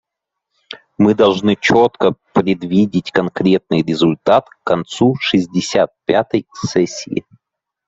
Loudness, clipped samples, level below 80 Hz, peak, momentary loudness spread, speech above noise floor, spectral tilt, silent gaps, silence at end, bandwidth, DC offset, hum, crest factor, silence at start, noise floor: -16 LUFS; under 0.1%; -54 dBFS; 0 dBFS; 8 LU; 65 dB; -6 dB/octave; none; 0.7 s; 8 kHz; under 0.1%; none; 16 dB; 0.7 s; -80 dBFS